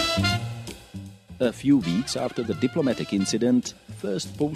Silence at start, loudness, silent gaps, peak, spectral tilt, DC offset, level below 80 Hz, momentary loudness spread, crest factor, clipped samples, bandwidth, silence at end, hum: 0 s; -25 LUFS; none; -8 dBFS; -5 dB/octave; under 0.1%; -52 dBFS; 16 LU; 16 dB; under 0.1%; 14.5 kHz; 0 s; none